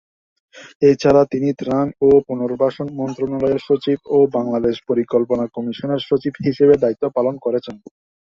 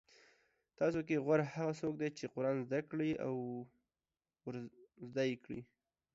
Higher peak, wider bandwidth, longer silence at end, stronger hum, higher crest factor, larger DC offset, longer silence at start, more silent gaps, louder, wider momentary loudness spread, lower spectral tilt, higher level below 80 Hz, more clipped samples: first, -2 dBFS vs -20 dBFS; about the same, 7 kHz vs 7.6 kHz; about the same, 0.55 s vs 0.5 s; neither; about the same, 16 dB vs 20 dB; neither; second, 0.55 s vs 0.8 s; first, 0.75-0.80 s vs none; first, -18 LUFS vs -39 LUFS; second, 9 LU vs 15 LU; about the same, -7.5 dB/octave vs -6.5 dB/octave; first, -52 dBFS vs -76 dBFS; neither